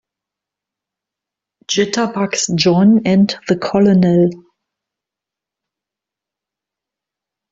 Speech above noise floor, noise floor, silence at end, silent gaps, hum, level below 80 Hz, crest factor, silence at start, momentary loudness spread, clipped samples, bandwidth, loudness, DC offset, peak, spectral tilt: 72 dB; -86 dBFS; 3.15 s; none; none; -56 dBFS; 16 dB; 1.7 s; 7 LU; under 0.1%; 7.8 kHz; -14 LUFS; under 0.1%; -2 dBFS; -5.5 dB/octave